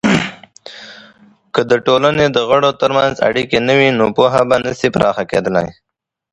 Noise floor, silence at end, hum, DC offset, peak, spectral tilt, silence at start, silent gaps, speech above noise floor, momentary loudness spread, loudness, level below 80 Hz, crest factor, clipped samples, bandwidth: -46 dBFS; 0.6 s; none; under 0.1%; 0 dBFS; -5.5 dB/octave; 0.05 s; none; 33 dB; 13 LU; -14 LUFS; -46 dBFS; 14 dB; under 0.1%; 11 kHz